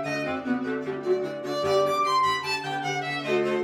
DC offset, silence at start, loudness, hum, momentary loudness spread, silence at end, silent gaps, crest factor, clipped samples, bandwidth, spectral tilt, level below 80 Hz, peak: under 0.1%; 0 s; -26 LUFS; none; 6 LU; 0 s; none; 14 dB; under 0.1%; 15.5 kHz; -4.5 dB/octave; -66 dBFS; -12 dBFS